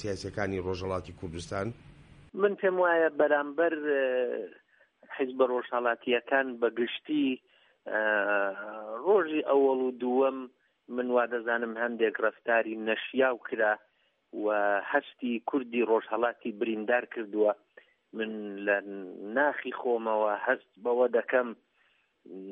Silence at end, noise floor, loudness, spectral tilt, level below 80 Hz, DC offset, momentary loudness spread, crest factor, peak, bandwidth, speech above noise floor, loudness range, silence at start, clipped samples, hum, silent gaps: 0 s; -70 dBFS; -29 LUFS; -6 dB/octave; -66 dBFS; under 0.1%; 12 LU; 18 dB; -12 dBFS; 9.8 kHz; 41 dB; 2 LU; 0 s; under 0.1%; none; none